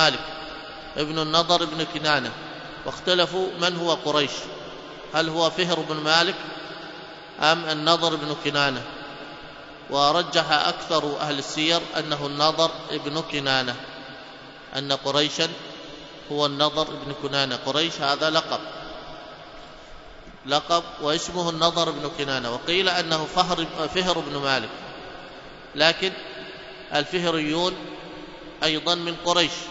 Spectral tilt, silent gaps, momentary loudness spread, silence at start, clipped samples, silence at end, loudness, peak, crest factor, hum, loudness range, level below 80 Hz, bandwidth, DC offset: -3.5 dB/octave; none; 18 LU; 0 s; under 0.1%; 0 s; -23 LUFS; 0 dBFS; 24 dB; none; 3 LU; -54 dBFS; 8 kHz; under 0.1%